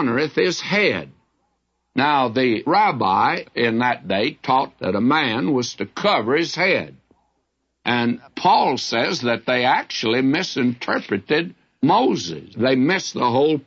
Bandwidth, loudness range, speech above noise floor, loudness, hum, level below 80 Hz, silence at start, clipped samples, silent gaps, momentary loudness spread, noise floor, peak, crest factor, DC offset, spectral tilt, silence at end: 7.8 kHz; 2 LU; 52 dB; -20 LUFS; none; -64 dBFS; 0 s; under 0.1%; none; 6 LU; -72 dBFS; -4 dBFS; 16 dB; under 0.1%; -5 dB/octave; 0.05 s